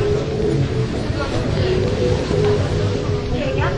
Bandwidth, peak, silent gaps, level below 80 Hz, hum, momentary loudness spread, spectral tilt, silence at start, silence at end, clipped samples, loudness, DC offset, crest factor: 11 kHz; -4 dBFS; none; -30 dBFS; none; 4 LU; -7 dB/octave; 0 s; 0 s; under 0.1%; -20 LUFS; under 0.1%; 14 dB